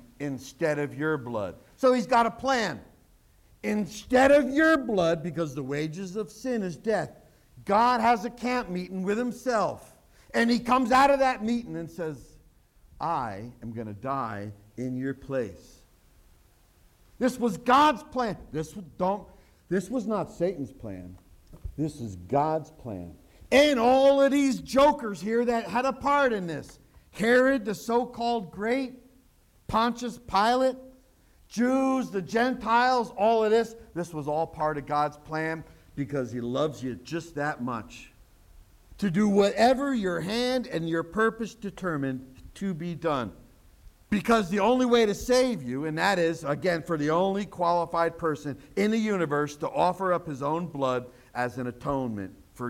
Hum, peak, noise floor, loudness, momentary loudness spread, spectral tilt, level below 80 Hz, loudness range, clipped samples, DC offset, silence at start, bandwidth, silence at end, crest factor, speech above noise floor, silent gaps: none; -8 dBFS; -61 dBFS; -27 LUFS; 15 LU; -5.5 dB/octave; -54 dBFS; 8 LU; under 0.1%; under 0.1%; 0.2 s; 16.5 kHz; 0 s; 18 dB; 34 dB; none